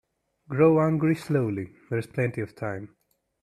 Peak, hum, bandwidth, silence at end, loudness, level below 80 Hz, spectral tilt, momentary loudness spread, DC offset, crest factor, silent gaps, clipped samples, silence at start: -8 dBFS; none; 13 kHz; 0.55 s; -26 LUFS; -64 dBFS; -8.5 dB/octave; 14 LU; under 0.1%; 18 dB; none; under 0.1%; 0.5 s